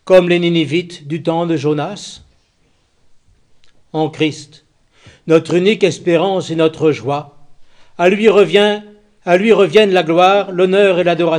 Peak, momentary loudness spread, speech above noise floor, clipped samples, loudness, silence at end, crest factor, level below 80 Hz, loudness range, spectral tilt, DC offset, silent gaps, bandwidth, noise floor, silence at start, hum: 0 dBFS; 14 LU; 45 dB; under 0.1%; -13 LUFS; 0 s; 14 dB; -56 dBFS; 11 LU; -6 dB/octave; under 0.1%; none; 10.5 kHz; -57 dBFS; 0.05 s; none